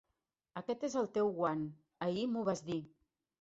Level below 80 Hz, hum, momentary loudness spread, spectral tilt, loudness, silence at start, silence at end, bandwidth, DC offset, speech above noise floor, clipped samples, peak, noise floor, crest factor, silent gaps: -76 dBFS; none; 10 LU; -6 dB/octave; -38 LUFS; 0.55 s; 0.55 s; 8 kHz; under 0.1%; 51 dB; under 0.1%; -20 dBFS; -87 dBFS; 18 dB; none